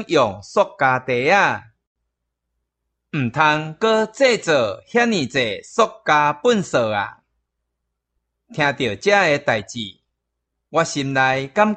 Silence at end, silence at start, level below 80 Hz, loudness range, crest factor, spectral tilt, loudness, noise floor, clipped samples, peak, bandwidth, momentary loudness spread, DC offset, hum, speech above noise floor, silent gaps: 0 s; 0 s; -60 dBFS; 3 LU; 18 dB; -4.5 dB/octave; -18 LUFS; -78 dBFS; under 0.1%; -2 dBFS; 9 kHz; 9 LU; under 0.1%; none; 59 dB; 1.87-1.95 s